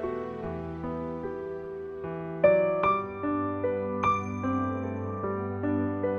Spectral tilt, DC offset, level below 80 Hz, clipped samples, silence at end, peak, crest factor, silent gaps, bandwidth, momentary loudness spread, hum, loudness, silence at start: -8.5 dB/octave; under 0.1%; -56 dBFS; under 0.1%; 0 s; -8 dBFS; 20 dB; none; 6.8 kHz; 12 LU; none; -30 LUFS; 0 s